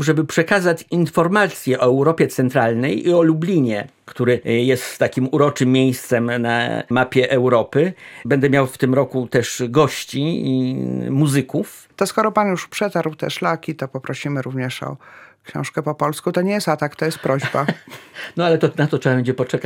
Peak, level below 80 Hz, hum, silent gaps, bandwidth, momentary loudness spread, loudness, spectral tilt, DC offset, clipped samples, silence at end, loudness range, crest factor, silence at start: -2 dBFS; -60 dBFS; none; none; 17 kHz; 9 LU; -19 LUFS; -6 dB/octave; under 0.1%; under 0.1%; 0 s; 6 LU; 16 dB; 0 s